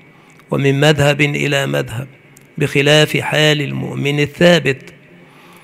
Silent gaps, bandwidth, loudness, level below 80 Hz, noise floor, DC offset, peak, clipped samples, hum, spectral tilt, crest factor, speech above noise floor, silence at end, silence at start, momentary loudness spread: none; 15.5 kHz; -14 LUFS; -50 dBFS; -45 dBFS; under 0.1%; 0 dBFS; under 0.1%; none; -5 dB/octave; 16 dB; 30 dB; 0.75 s; 0.5 s; 13 LU